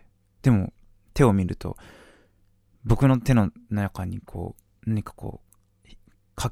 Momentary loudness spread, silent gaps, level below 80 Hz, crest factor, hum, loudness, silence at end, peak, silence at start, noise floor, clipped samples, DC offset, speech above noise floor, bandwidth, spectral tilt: 18 LU; none; -40 dBFS; 22 dB; none; -25 LUFS; 0 s; -4 dBFS; 0.45 s; -62 dBFS; under 0.1%; under 0.1%; 39 dB; 14.5 kHz; -7.5 dB/octave